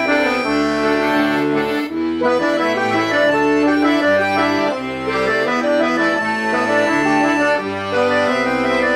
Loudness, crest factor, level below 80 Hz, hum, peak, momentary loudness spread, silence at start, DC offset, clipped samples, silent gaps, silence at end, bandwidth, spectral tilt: -16 LUFS; 12 dB; -50 dBFS; none; -4 dBFS; 4 LU; 0 s; under 0.1%; under 0.1%; none; 0 s; 14 kHz; -4.5 dB/octave